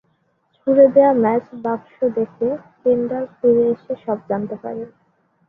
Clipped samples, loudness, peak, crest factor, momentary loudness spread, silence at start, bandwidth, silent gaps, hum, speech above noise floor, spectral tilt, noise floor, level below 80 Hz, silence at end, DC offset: under 0.1%; -18 LUFS; -2 dBFS; 18 dB; 15 LU; 0.65 s; 3.7 kHz; none; none; 47 dB; -10.5 dB/octave; -65 dBFS; -62 dBFS; 0.6 s; under 0.1%